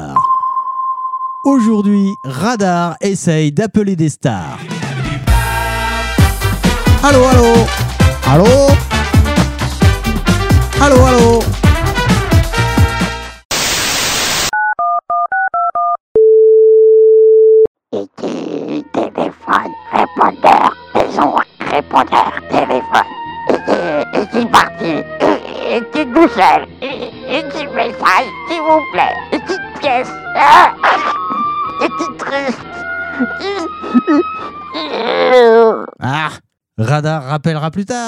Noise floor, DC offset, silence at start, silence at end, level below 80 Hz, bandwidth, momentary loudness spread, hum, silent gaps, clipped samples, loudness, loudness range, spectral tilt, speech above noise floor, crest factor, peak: -35 dBFS; under 0.1%; 0 s; 0 s; -24 dBFS; 16.5 kHz; 13 LU; none; 13.45-13.50 s, 16.00-16.15 s, 17.67-17.75 s; 0.5%; -13 LUFS; 5 LU; -5.5 dB/octave; 25 dB; 12 dB; 0 dBFS